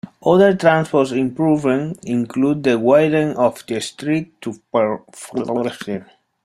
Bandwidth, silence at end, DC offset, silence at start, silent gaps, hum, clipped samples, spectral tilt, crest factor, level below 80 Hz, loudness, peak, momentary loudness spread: 13.5 kHz; 0.4 s; under 0.1%; 0.05 s; none; none; under 0.1%; -6.5 dB/octave; 16 dB; -58 dBFS; -18 LUFS; 0 dBFS; 14 LU